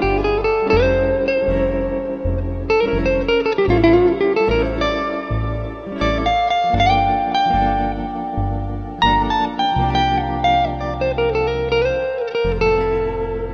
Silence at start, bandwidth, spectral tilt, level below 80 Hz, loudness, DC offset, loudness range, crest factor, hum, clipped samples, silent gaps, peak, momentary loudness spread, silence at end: 0 s; 6.8 kHz; -7 dB/octave; -28 dBFS; -18 LUFS; under 0.1%; 2 LU; 16 dB; none; under 0.1%; none; -2 dBFS; 8 LU; 0 s